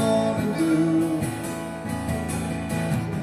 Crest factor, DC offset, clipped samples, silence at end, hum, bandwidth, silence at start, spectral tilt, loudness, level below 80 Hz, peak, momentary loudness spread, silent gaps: 16 dB; under 0.1%; under 0.1%; 0 s; none; 14 kHz; 0 s; -6.5 dB/octave; -25 LUFS; -46 dBFS; -10 dBFS; 9 LU; none